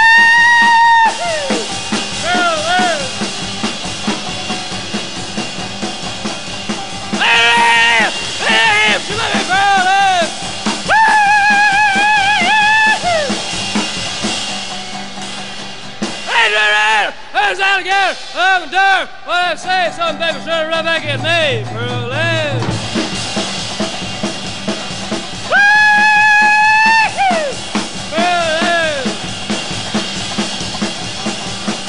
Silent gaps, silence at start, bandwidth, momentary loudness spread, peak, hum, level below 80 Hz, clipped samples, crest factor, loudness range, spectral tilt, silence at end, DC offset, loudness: none; 0 s; 11 kHz; 13 LU; 0 dBFS; none; -44 dBFS; under 0.1%; 14 dB; 8 LU; -2.5 dB/octave; 0 s; 3%; -13 LUFS